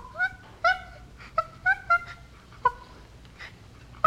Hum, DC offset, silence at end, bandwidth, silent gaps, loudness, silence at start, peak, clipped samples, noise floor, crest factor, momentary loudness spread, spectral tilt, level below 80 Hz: none; under 0.1%; 0.6 s; 13.5 kHz; none; -27 LUFS; 0 s; -6 dBFS; under 0.1%; -49 dBFS; 22 dB; 21 LU; -3.5 dB/octave; -52 dBFS